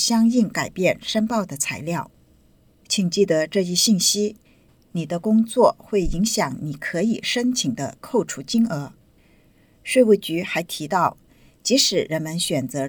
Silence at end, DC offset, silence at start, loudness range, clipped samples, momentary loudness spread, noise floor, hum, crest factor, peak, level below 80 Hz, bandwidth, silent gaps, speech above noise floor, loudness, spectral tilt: 0 s; under 0.1%; 0 s; 3 LU; under 0.1%; 11 LU; -56 dBFS; none; 20 dB; -2 dBFS; -44 dBFS; over 20 kHz; none; 35 dB; -21 LUFS; -4 dB/octave